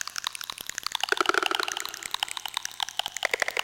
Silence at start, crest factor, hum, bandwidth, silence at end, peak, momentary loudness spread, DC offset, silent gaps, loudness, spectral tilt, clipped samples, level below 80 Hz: 0 s; 24 dB; 60 Hz at -70 dBFS; 17 kHz; 0 s; -8 dBFS; 9 LU; under 0.1%; none; -29 LUFS; 0.5 dB/octave; under 0.1%; -66 dBFS